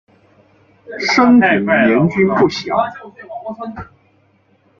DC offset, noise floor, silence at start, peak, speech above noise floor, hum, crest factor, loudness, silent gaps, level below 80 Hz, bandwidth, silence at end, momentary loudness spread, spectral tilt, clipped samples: under 0.1%; -56 dBFS; 0.9 s; -2 dBFS; 41 dB; none; 16 dB; -13 LUFS; none; -52 dBFS; 7.2 kHz; 0.95 s; 22 LU; -6 dB/octave; under 0.1%